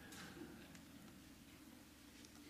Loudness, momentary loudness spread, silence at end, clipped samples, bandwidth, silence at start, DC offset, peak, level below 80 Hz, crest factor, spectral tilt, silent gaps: -59 LUFS; 6 LU; 0 s; under 0.1%; 15.5 kHz; 0 s; under 0.1%; -42 dBFS; -74 dBFS; 18 dB; -3.5 dB/octave; none